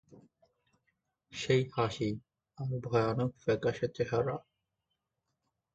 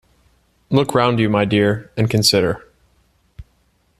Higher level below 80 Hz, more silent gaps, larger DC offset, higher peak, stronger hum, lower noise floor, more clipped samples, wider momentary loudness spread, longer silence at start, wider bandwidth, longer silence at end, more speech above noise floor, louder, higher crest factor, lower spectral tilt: second, -64 dBFS vs -48 dBFS; neither; neither; second, -14 dBFS vs -2 dBFS; neither; first, -85 dBFS vs -61 dBFS; neither; first, 12 LU vs 7 LU; second, 0.1 s vs 0.7 s; second, 8.4 kHz vs 14 kHz; first, 1.35 s vs 0.55 s; first, 53 dB vs 45 dB; second, -33 LUFS vs -17 LUFS; about the same, 20 dB vs 18 dB; first, -6.5 dB/octave vs -5 dB/octave